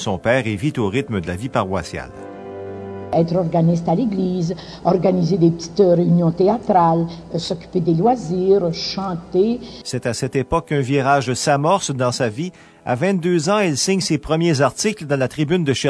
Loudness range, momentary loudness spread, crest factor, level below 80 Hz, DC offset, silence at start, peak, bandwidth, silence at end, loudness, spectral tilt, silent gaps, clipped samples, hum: 4 LU; 10 LU; 16 dB; -46 dBFS; under 0.1%; 0 s; -2 dBFS; 11 kHz; 0 s; -19 LUFS; -5.5 dB/octave; none; under 0.1%; none